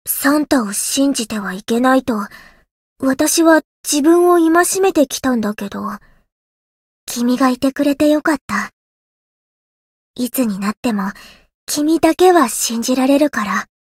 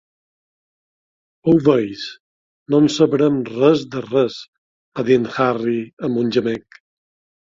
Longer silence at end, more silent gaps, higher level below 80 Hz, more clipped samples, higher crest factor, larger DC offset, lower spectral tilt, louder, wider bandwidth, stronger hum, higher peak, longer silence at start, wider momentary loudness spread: second, 0.15 s vs 0.95 s; first, 2.71-2.96 s, 3.65-3.84 s, 6.32-7.07 s, 8.41-8.48 s, 8.73-10.14 s, 10.77-10.83 s, 11.54-11.67 s vs 2.20-2.66 s, 4.48-4.92 s, 5.93-5.97 s; first, -52 dBFS vs -58 dBFS; neither; about the same, 16 dB vs 18 dB; neither; second, -3.5 dB/octave vs -6.5 dB/octave; first, -15 LUFS vs -18 LUFS; first, 16.5 kHz vs 7.8 kHz; neither; about the same, 0 dBFS vs -2 dBFS; second, 0.05 s vs 1.45 s; about the same, 13 LU vs 12 LU